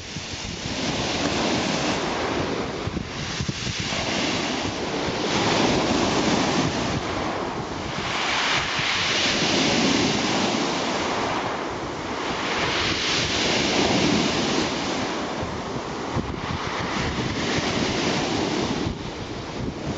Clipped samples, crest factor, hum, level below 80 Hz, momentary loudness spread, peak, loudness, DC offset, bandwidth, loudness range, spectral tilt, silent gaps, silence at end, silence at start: under 0.1%; 16 dB; none; -44 dBFS; 9 LU; -8 dBFS; -24 LUFS; under 0.1%; 9 kHz; 4 LU; -3.5 dB/octave; none; 0 s; 0 s